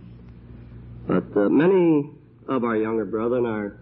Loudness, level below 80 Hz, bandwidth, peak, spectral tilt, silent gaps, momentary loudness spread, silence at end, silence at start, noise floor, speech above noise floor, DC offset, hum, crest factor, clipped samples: -22 LUFS; -52 dBFS; 4.1 kHz; -8 dBFS; -12 dB/octave; none; 19 LU; 0.05 s; 0 s; -43 dBFS; 22 dB; under 0.1%; none; 14 dB; under 0.1%